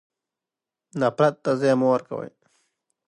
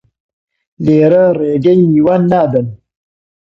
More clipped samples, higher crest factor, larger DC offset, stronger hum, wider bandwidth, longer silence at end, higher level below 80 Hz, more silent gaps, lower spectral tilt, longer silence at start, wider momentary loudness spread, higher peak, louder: neither; first, 20 dB vs 12 dB; neither; neither; first, 10 kHz vs 6 kHz; first, 0.8 s vs 0.65 s; second, -74 dBFS vs -50 dBFS; neither; second, -7 dB/octave vs -10 dB/octave; first, 0.95 s vs 0.8 s; first, 15 LU vs 8 LU; second, -6 dBFS vs 0 dBFS; second, -22 LUFS vs -11 LUFS